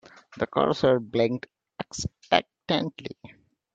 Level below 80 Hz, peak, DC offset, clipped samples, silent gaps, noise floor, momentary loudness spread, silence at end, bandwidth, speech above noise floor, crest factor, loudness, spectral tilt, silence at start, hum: -56 dBFS; -2 dBFS; under 0.1%; under 0.1%; none; -52 dBFS; 18 LU; 0.5 s; 9 kHz; 27 dB; 24 dB; -26 LUFS; -5 dB/octave; 0.3 s; none